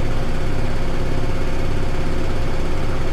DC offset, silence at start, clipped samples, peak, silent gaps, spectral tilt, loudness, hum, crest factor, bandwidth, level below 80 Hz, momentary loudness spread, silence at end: under 0.1%; 0 s; under 0.1%; -6 dBFS; none; -6.5 dB/octave; -25 LUFS; none; 8 dB; 8.4 kHz; -20 dBFS; 1 LU; 0 s